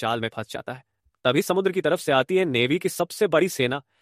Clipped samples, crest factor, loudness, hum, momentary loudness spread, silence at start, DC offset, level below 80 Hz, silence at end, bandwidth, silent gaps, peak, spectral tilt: under 0.1%; 18 dB; -23 LUFS; none; 12 LU; 0 s; under 0.1%; -64 dBFS; 0.2 s; 15.5 kHz; none; -6 dBFS; -4.5 dB/octave